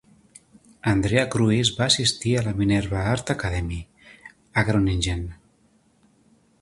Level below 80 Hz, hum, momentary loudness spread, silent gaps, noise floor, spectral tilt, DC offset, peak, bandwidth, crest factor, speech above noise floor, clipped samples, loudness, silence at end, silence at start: -40 dBFS; none; 10 LU; none; -61 dBFS; -4.5 dB/octave; under 0.1%; -6 dBFS; 11.5 kHz; 20 dB; 39 dB; under 0.1%; -23 LUFS; 1.25 s; 0.85 s